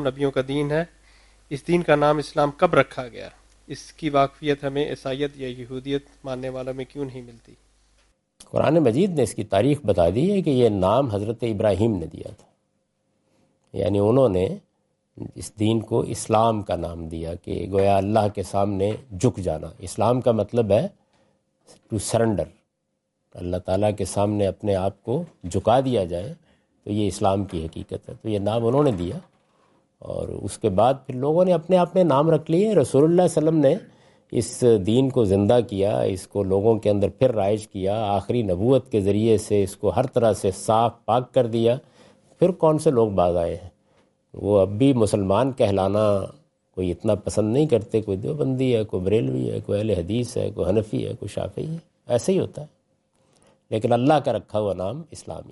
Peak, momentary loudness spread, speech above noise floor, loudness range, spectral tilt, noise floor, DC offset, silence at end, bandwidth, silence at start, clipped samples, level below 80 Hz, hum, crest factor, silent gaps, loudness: -4 dBFS; 13 LU; 54 dB; 6 LU; -7 dB/octave; -76 dBFS; under 0.1%; 0.1 s; 11.5 kHz; 0 s; under 0.1%; -54 dBFS; none; 18 dB; none; -22 LUFS